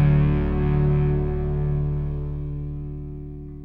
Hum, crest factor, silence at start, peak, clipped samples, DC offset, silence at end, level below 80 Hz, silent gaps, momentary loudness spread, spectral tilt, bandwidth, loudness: none; 14 dB; 0 s; -8 dBFS; under 0.1%; under 0.1%; 0 s; -28 dBFS; none; 14 LU; -11.5 dB/octave; 3.8 kHz; -24 LUFS